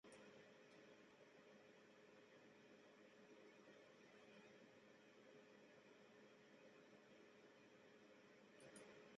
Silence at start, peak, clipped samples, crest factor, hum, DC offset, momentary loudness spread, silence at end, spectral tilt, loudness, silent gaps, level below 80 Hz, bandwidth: 0.05 s; -50 dBFS; under 0.1%; 18 dB; none; under 0.1%; 4 LU; 0 s; -3 dB/octave; -68 LUFS; none; under -90 dBFS; 7.6 kHz